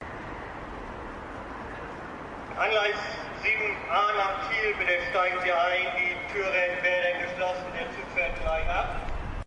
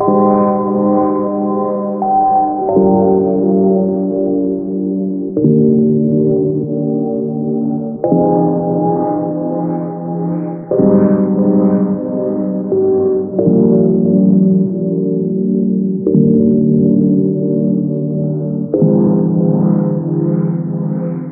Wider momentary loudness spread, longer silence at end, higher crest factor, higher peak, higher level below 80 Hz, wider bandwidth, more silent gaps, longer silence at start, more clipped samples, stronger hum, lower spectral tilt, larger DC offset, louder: first, 14 LU vs 7 LU; about the same, 0 s vs 0 s; about the same, 16 dB vs 12 dB; second, -12 dBFS vs 0 dBFS; first, -42 dBFS vs -50 dBFS; first, 11 kHz vs 2.2 kHz; neither; about the same, 0 s vs 0 s; neither; neither; second, -4.5 dB/octave vs -10.5 dB/octave; neither; second, -27 LUFS vs -14 LUFS